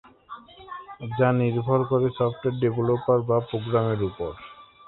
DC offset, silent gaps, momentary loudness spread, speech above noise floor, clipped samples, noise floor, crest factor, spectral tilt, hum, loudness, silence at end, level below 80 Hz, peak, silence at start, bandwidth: under 0.1%; none; 20 LU; 21 dB; under 0.1%; -45 dBFS; 18 dB; -12 dB/octave; none; -24 LUFS; 0.25 s; -54 dBFS; -6 dBFS; 0.3 s; 4.1 kHz